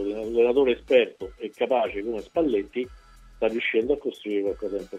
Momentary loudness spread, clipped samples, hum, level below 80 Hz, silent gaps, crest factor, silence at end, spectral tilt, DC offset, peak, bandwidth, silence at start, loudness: 11 LU; under 0.1%; none; -52 dBFS; none; 18 dB; 0 s; -5.5 dB/octave; under 0.1%; -8 dBFS; 9.2 kHz; 0 s; -25 LUFS